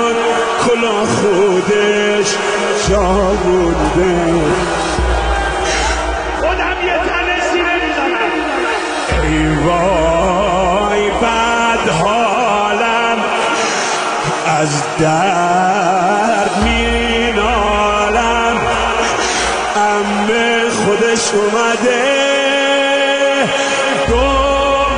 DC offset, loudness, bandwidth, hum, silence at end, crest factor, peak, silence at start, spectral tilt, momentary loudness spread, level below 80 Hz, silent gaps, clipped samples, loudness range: under 0.1%; -13 LUFS; 10 kHz; none; 0 s; 12 dB; -2 dBFS; 0 s; -4 dB/octave; 3 LU; -28 dBFS; none; under 0.1%; 2 LU